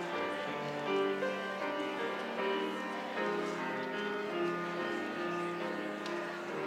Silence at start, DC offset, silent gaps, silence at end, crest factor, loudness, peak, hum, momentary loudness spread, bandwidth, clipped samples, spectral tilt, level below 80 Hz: 0 s; under 0.1%; none; 0 s; 14 dB; -36 LUFS; -22 dBFS; none; 4 LU; 16 kHz; under 0.1%; -5 dB/octave; -86 dBFS